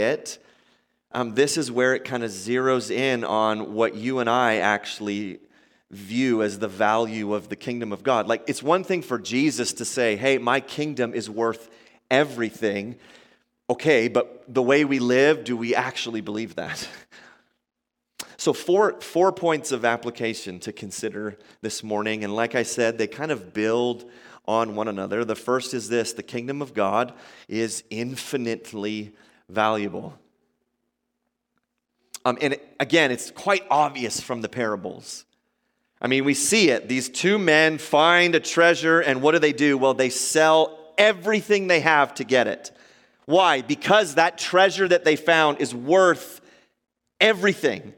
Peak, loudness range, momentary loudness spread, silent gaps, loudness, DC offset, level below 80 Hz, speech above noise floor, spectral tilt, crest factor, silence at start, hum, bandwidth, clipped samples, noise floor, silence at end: 0 dBFS; 9 LU; 13 LU; none; -22 LUFS; under 0.1%; -70 dBFS; 56 dB; -3.5 dB/octave; 22 dB; 0 s; none; 17 kHz; under 0.1%; -78 dBFS; 0.05 s